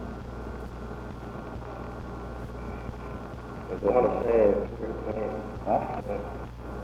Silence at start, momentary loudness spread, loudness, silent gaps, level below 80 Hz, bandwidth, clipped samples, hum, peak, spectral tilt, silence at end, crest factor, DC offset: 0 s; 15 LU; -31 LUFS; none; -42 dBFS; 12.5 kHz; under 0.1%; none; -10 dBFS; -8.5 dB/octave; 0 s; 22 dB; under 0.1%